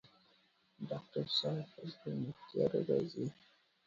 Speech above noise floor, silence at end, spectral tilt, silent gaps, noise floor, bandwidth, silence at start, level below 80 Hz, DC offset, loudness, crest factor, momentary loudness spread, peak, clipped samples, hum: 34 dB; 0.55 s; -5.5 dB/octave; none; -72 dBFS; 7.4 kHz; 0.8 s; -76 dBFS; under 0.1%; -39 LUFS; 20 dB; 11 LU; -20 dBFS; under 0.1%; none